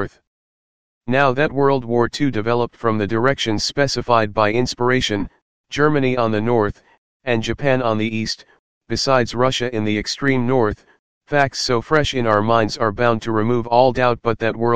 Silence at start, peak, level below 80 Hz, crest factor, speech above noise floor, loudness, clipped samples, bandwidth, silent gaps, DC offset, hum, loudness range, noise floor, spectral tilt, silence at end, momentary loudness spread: 0 s; 0 dBFS; -44 dBFS; 18 dB; over 72 dB; -18 LUFS; under 0.1%; 9.8 kHz; 0.27-1.01 s, 5.42-5.64 s, 6.98-7.20 s, 8.59-8.81 s, 10.99-11.21 s; 2%; none; 3 LU; under -90 dBFS; -5.5 dB/octave; 0 s; 6 LU